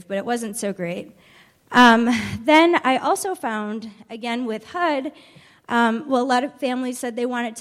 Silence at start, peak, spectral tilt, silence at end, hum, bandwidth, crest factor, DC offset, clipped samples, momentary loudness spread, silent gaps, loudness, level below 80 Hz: 0.1 s; -2 dBFS; -4 dB/octave; 0 s; none; 15 kHz; 18 dB; under 0.1%; under 0.1%; 15 LU; none; -20 LUFS; -60 dBFS